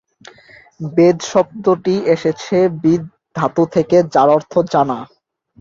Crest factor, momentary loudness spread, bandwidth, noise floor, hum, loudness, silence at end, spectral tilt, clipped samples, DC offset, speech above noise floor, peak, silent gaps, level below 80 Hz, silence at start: 14 dB; 8 LU; 7.6 kHz; -45 dBFS; none; -15 LUFS; 0.55 s; -6.5 dB/octave; under 0.1%; under 0.1%; 31 dB; -2 dBFS; none; -56 dBFS; 0.8 s